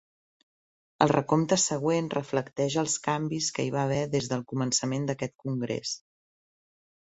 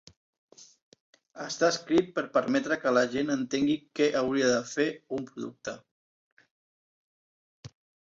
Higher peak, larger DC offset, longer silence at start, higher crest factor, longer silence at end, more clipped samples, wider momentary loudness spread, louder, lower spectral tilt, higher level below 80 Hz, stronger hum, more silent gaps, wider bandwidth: first, -4 dBFS vs -10 dBFS; neither; first, 1 s vs 0.6 s; about the same, 24 dB vs 20 dB; first, 1.25 s vs 0.35 s; neither; second, 8 LU vs 13 LU; about the same, -28 LUFS vs -28 LUFS; about the same, -4.5 dB/octave vs -4 dB/octave; about the same, -64 dBFS vs -68 dBFS; neither; second, none vs 0.82-0.92 s, 1.00-1.13 s, 5.91-6.37 s, 6.51-7.63 s; about the same, 8.4 kHz vs 7.8 kHz